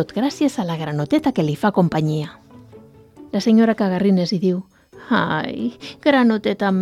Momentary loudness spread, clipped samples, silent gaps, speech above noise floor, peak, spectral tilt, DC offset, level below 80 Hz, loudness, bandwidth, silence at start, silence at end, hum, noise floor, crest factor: 11 LU; under 0.1%; none; 26 dB; -2 dBFS; -7 dB/octave; under 0.1%; -56 dBFS; -19 LUFS; 13.5 kHz; 0 s; 0 s; none; -45 dBFS; 16 dB